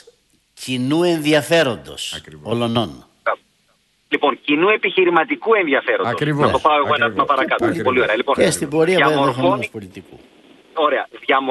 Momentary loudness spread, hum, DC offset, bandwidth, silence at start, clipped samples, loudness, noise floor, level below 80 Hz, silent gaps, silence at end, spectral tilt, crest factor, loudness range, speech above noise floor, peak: 12 LU; none; under 0.1%; 12 kHz; 0.6 s; under 0.1%; -17 LUFS; -61 dBFS; -54 dBFS; none; 0 s; -4.5 dB/octave; 18 dB; 4 LU; 44 dB; 0 dBFS